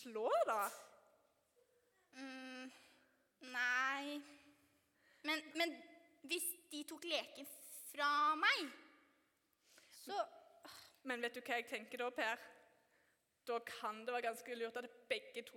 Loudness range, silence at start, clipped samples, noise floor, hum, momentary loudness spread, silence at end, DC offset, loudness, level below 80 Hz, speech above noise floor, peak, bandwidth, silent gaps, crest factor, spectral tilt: 6 LU; 0 s; under 0.1%; -80 dBFS; none; 21 LU; 0 s; under 0.1%; -42 LUFS; under -90 dBFS; 38 dB; -22 dBFS; 18 kHz; none; 22 dB; -0.5 dB/octave